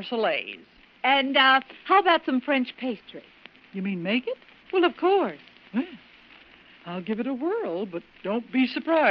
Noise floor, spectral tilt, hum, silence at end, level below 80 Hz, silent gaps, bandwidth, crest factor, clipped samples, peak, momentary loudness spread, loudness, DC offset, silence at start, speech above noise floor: -52 dBFS; -1.5 dB/octave; none; 0 s; -72 dBFS; none; 5.8 kHz; 18 dB; under 0.1%; -8 dBFS; 19 LU; -25 LUFS; under 0.1%; 0 s; 28 dB